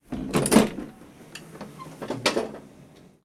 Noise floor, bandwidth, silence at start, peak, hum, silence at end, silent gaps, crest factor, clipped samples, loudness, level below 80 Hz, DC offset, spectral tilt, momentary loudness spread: -51 dBFS; 18 kHz; 0.1 s; -2 dBFS; none; 0.4 s; none; 26 dB; under 0.1%; -24 LUFS; -50 dBFS; under 0.1%; -4 dB/octave; 23 LU